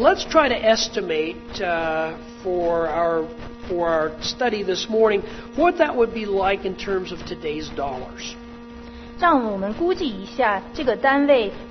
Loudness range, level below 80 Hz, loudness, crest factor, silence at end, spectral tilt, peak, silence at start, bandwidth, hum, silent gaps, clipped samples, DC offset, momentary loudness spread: 4 LU; -44 dBFS; -22 LUFS; 20 dB; 0 s; -4 dB/octave; -2 dBFS; 0 s; 6.4 kHz; none; none; under 0.1%; under 0.1%; 13 LU